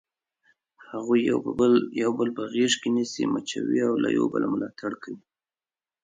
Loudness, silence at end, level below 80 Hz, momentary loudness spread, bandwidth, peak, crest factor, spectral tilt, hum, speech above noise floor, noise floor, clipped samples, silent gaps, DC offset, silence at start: -25 LUFS; 0.85 s; -66 dBFS; 13 LU; 9.6 kHz; -10 dBFS; 16 dB; -4.5 dB/octave; none; over 65 dB; under -90 dBFS; under 0.1%; none; under 0.1%; 0.9 s